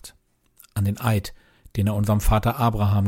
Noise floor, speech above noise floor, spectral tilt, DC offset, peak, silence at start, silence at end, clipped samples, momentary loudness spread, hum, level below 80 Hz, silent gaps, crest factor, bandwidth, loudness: -60 dBFS; 40 dB; -7 dB/octave; under 0.1%; -8 dBFS; 0.05 s; 0 s; under 0.1%; 12 LU; none; -32 dBFS; none; 14 dB; 16.5 kHz; -23 LUFS